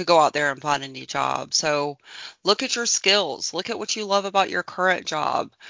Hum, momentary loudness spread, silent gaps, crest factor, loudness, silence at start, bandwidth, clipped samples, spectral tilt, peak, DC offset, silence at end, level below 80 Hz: none; 9 LU; none; 20 dB; -22 LUFS; 0 s; 7.8 kHz; under 0.1%; -1.5 dB/octave; -4 dBFS; under 0.1%; 0 s; -66 dBFS